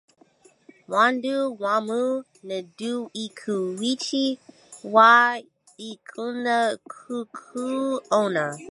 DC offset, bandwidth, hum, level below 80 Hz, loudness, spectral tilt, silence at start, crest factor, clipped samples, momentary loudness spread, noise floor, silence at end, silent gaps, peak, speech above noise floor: under 0.1%; 11.5 kHz; none; -80 dBFS; -23 LUFS; -4 dB/octave; 0.9 s; 22 dB; under 0.1%; 18 LU; -58 dBFS; 0 s; none; -2 dBFS; 34 dB